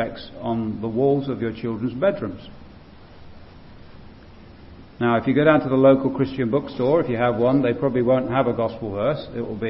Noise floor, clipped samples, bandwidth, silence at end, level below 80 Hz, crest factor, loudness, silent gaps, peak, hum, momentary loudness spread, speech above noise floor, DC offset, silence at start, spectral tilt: -44 dBFS; under 0.1%; 5.8 kHz; 0 s; -50 dBFS; 18 dB; -21 LUFS; none; -4 dBFS; none; 11 LU; 23 dB; under 0.1%; 0 s; -11 dB/octave